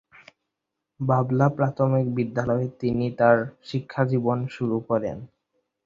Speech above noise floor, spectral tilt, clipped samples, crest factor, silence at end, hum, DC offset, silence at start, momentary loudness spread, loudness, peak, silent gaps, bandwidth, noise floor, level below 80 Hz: 60 dB; -9 dB/octave; under 0.1%; 22 dB; 0.6 s; none; under 0.1%; 1 s; 11 LU; -24 LUFS; -4 dBFS; none; 7.4 kHz; -83 dBFS; -58 dBFS